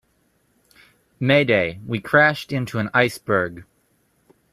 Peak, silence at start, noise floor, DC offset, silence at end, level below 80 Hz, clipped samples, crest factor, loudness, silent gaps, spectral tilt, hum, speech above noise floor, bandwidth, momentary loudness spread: -2 dBFS; 1.2 s; -65 dBFS; under 0.1%; 0.9 s; -58 dBFS; under 0.1%; 22 dB; -20 LUFS; none; -6 dB/octave; none; 45 dB; 14.5 kHz; 10 LU